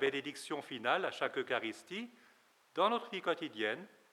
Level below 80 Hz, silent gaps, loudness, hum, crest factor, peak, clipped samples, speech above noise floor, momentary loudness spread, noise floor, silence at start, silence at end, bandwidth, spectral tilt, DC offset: under -90 dBFS; none; -37 LUFS; none; 20 dB; -18 dBFS; under 0.1%; 31 dB; 12 LU; -68 dBFS; 0 s; 0.25 s; 14.5 kHz; -3.5 dB/octave; under 0.1%